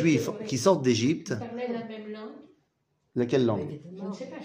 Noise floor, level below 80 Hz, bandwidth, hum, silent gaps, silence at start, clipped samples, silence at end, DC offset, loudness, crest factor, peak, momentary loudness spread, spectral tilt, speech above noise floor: -75 dBFS; -68 dBFS; 15.5 kHz; none; none; 0 s; under 0.1%; 0 s; under 0.1%; -28 LUFS; 18 dB; -10 dBFS; 15 LU; -5.5 dB/octave; 48 dB